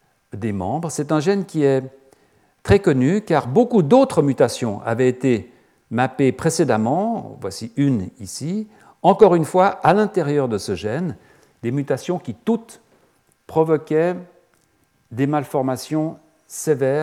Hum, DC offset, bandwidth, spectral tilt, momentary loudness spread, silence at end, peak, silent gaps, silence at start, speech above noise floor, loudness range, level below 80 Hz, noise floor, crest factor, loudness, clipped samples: none; under 0.1%; 15.5 kHz; -6.5 dB/octave; 13 LU; 0 s; 0 dBFS; none; 0.35 s; 44 dB; 6 LU; -52 dBFS; -62 dBFS; 20 dB; -19 LUFS; under 0.1%